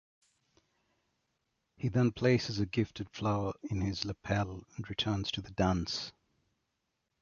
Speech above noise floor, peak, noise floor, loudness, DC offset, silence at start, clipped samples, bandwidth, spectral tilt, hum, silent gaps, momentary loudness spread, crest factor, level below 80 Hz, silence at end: 50 dB; -14 dBFS; -83 dBFS; -34 LUFS; under 0.1%; 1.8 s; under 0.1%; 7.2 kHz; -6 dB/octave; none; none; 9 LU; 22 dB; -54 dBFS; 1.1 s